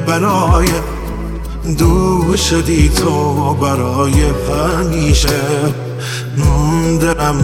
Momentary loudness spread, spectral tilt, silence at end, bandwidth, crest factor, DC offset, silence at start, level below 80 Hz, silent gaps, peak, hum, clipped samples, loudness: 9 LU; -5.5 dB/octave; 0 s; 17.5 kHz; 12 dB; 0.3%; 0 s; -20 dBFS; none; 0 dBFS; none; under 0.1%; -14 LUFS